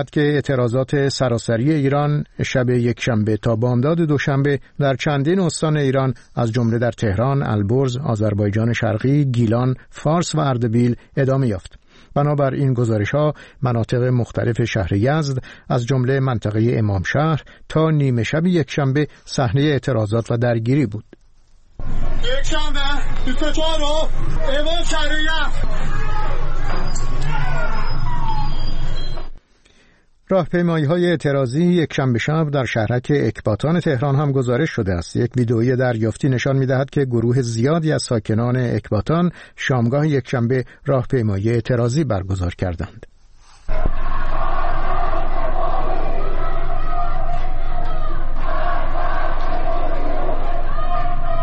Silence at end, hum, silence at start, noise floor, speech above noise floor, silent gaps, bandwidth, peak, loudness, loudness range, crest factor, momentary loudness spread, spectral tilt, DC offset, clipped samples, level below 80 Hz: 0 s; none; 0 s; -53 dBFS; 36 dB; none; 8.6 kHz; -6 dBFS; -20 LUFS; 7 LU; 12 dB; 8 LU; -6.5 dB/octave; 0.1%; under 0.1%; -22 dBFS